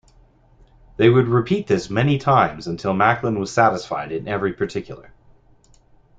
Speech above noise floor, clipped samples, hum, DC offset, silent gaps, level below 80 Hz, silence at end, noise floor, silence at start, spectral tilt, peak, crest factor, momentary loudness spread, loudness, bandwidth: 34 dB; under 0.1%; none; under 0.1%; none; -50 dBFS; 1.15 s; -53 dBFS; 1 s; -7 dB/octave; -2 dBFS; 18 dB; 10 LU; -19 LUFS; 9 kHz